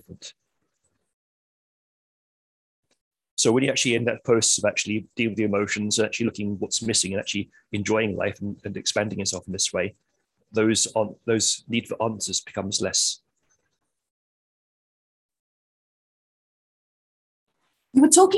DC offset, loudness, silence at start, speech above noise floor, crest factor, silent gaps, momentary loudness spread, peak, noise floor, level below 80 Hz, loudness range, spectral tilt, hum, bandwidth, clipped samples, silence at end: under 0.1%; -23 LUFS; 0.1 s; 54 dB; 24 dB; 1.13-2.83 s, 3.01-3.11 s, 3.31-3.37 s, 14.10-15.29 s, 15.39-17.47 s; 11 LU; -2 dBFS; -78 dBFS; -58 dBFS; 6 LU; -3 dB/octave; none; 13 kHz; under 0.1%; 0 s